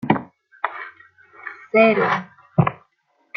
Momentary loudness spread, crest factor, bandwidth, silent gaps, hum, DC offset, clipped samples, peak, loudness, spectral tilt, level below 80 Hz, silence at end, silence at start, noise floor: 21 LU; 20 dB; 6.4 kHz; none; none; under 0.1%; under 0.1%; -2 dBFS; -20 LUFS; -8.5 dB/octave; -56 dBFS; 0.6 s; 0.05 s; -66 dBFS